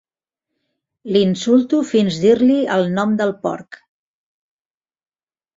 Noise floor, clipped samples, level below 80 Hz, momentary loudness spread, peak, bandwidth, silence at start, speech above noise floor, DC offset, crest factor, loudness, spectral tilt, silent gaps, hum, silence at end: under -90 dBFS; under 0.1%; -60 dBFS; 8 LU; -2 dBFS; 7.8 kHz; 1.05 s; over 74 dB; under 0.1%; 16 dB; -16 LUFS; -6.5 dB/octave; none; none; 1.8 s